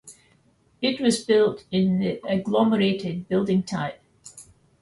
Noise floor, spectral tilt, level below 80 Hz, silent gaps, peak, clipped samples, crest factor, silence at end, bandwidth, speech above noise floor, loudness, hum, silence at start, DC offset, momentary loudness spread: -62 dBFS; -6 dB/octave; -60 dBFS; none; -8 dBFS; under 0.1%; 16 dB; 0.4 s; 11.5 kHz; 39 dB; -23 LUFS; none; 0.05 s; under 0.1%; 10 LU